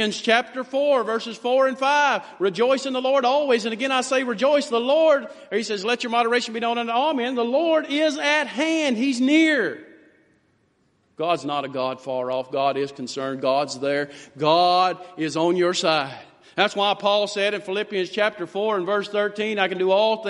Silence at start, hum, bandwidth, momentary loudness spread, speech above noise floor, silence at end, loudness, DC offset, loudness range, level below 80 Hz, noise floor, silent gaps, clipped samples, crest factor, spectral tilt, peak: 0 s; none; 11.5 kHz; 8 LU; 43 dB; 0 s; -22 LUFS; under 0.1%; 4 LU; -74 dBFS; -65 dBFS; none; under 0.1%; 20 dB; -3.5 dB/octave; -2 dBFS